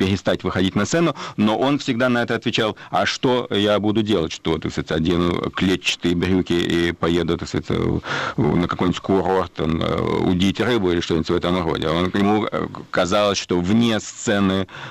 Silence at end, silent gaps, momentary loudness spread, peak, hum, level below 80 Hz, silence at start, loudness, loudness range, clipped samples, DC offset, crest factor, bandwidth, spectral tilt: 0 s; none; 5 LU; -8 dBFS; none; -44 dBFS; 0 s; -20 LUFS; 1 LU; under 0.1%; under 0.1%; 12 dB; 14 kHz; -5.5 dB/octave